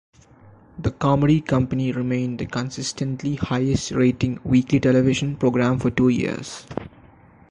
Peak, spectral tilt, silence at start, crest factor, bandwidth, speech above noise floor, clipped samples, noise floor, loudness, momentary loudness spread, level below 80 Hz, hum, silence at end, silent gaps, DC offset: -6 dBFS; -6.5 dB/octave; 0.75 s; 16 dB; 10.5 kHz; 29 dB; under 0.1%; -50 dBFS; -21 LUFS; 10 LU; -44 dBFS; none; 0.6 s; none; under 0.1%